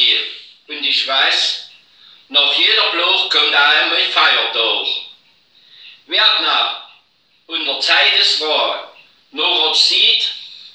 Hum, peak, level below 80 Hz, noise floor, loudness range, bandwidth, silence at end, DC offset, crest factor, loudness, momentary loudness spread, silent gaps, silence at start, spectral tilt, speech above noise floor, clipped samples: none; 0 dBFS; -82 dBFS; -57 dBFS; 4 LU; 10 kHz; 0.05 s; under 0.1%; 16 dB; -13 LUFS; 13 LU; none; 0 s; 1.5 dB/octave; 42 dB; under 0.1%